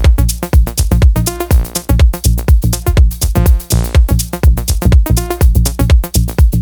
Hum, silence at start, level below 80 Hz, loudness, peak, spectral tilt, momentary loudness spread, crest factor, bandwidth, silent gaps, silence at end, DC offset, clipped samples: none; 0 s; -12 dBFS; -12 LUFS; 0 dBFS; -5.5 dB/octave; 3 LU; 10 dB; over 20 kHz; none; 0 s; under 0.1%; 0.2%